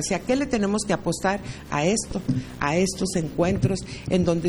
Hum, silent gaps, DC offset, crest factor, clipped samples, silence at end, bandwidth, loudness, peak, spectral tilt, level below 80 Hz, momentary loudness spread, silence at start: none; none; under 0.1%; 16 dB; under 0.1%; 0 s; over 20 kHz; -25 LUFS; -8 dBFS; -5 dB/octave; -44 dBFS; 5 LU; 0 s